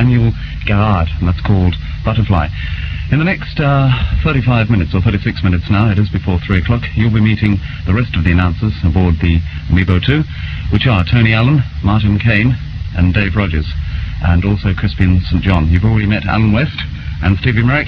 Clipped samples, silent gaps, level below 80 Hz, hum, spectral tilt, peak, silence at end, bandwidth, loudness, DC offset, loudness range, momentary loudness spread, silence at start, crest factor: under 0.1%; none; -22 dBFS; none; -9 dB/octave; 0 dBFS; 0 s; 6 kHz; -14 LUFS; under 0.1%; 2 LU; 7 LU; 0 s; 12 dB